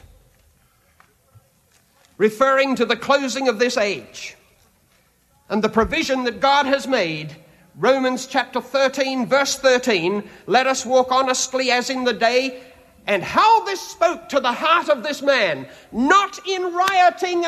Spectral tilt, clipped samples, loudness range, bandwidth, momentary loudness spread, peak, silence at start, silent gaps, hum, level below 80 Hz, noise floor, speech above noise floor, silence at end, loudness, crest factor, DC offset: -3 dB/octave; under 0.1%; 3 LU; 14 kHz; 8 LU; -4 dBFS; 2.2 s; none; none; -52 dBFS; -59 dBFS; 40 dB; 0 s; -19 LUFS; 16 dB; under 0.1%